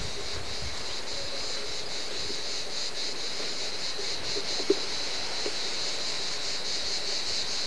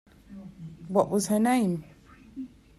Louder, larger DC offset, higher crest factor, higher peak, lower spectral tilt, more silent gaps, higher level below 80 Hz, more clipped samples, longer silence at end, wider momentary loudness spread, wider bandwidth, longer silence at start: second, -30 LUFS vs -26 LUFS; first, 2% vs under 0.1%; about the same, 22 dB vs 20 dB; about the same, -10 dBFS vs -10 dBFS; second, -1 dB/octave vs -5.5 dB/octave; neither; first, -54 dBFS vs -60 dBFS; neither; second, 0 s vs 0.3 s; second, 5 LU vs 22 LU; second, 11 kHz vs 14 kHz; second, 0 s vs 0.3 s